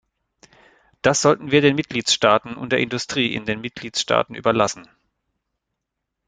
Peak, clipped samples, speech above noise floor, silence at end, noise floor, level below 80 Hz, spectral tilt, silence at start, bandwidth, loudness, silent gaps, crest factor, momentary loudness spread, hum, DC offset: -2 dBFS; under 0.1%; 60 dB; 1.45 s; -80 dBFS; -56 dBFS; -3.5 dB/octave; 1.05 s; 9.6 kHz; -20 LUFS; none; 20 dB; 9 LU; none; under 0.1%